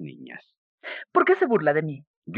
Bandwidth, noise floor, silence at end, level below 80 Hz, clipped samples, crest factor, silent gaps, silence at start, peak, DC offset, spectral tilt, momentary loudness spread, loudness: 4.8 kHz; -43 dBFS; 0 s; -78 dBFS; under 0.1%; 20 dB; 0.58-0.78 s, 2.07-2.22 s; 0 s; -6 dBFS; under 0.1%; -9 dB/octave; 22 LU; -22 LUFS